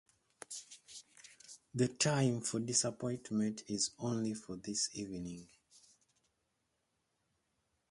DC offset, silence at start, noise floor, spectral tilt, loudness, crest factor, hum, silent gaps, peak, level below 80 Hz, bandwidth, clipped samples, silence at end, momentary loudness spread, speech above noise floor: under 0.1%; 0.5 s; -83 dBFS; -4 dB/octave; -37 LUFS; 22 dB; none; none; -18 dBFS; -72 dBFS; 11.5 kHz; under 0.1%; 2.45 s; 21 LU; 46 dB